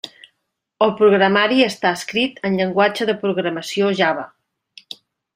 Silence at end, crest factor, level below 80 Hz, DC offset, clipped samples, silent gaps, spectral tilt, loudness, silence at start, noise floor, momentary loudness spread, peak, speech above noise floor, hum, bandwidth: 1.1 s; 18 dB; -64 dBFS; under 0.1%; under 0.1%; none; -5 dB/octave; -18 LUFS; 0.05 s; -75 dBFS; 22 LU; -2 dBFS; 58 dB; none; 15.5 kHz